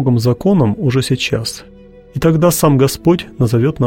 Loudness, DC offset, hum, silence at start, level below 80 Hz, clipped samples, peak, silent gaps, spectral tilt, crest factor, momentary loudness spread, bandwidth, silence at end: -14 LUFS; under 0.1%; none; 0 s; -40 dBFS; under 0.1%; 0 dBFS; none; -6 dB/octave; 12 dB; 8 LU; 17 kHz; 0 s